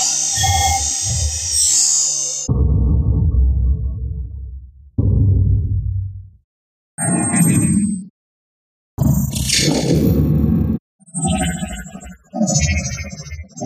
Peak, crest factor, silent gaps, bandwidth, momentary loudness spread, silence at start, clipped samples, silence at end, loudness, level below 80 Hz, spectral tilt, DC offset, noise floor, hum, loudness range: -2 dBFS; 16 dB; 6.44-6.98 s, 8.10-8.97 s, 10.79-10.99 s; 15.5 kHz; 16 LU; 0 s; under 0.1%; 0 s; -16 LUFS; -24 dBFS; -4 dB/octave; under 0.1%; under -90 dBFS; none; 5 LU